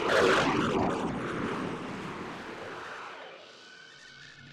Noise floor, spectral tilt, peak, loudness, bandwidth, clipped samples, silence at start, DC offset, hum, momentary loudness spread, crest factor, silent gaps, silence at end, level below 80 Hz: -51 dBFS; -5 dB/octave; -12 dBFS; -31 LUFS; 14.5 kHz; under 0.1%; 0 s; under 0.1%; none; 24 LU; 20 dB; none; 0 s; -58 dBFS